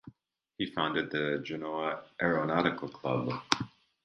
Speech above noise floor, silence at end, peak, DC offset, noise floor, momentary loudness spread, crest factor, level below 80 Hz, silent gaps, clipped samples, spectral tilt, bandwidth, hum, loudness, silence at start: 35 dB; 0.35 s; -2 dBFS; under 0.1%; -67 dBFS; 7 LU; 32 dB; -66 dBFS; none; under 0.1%; -5 dB/octave; 10.5 kHz; none; -32 LUFS; 0.05 s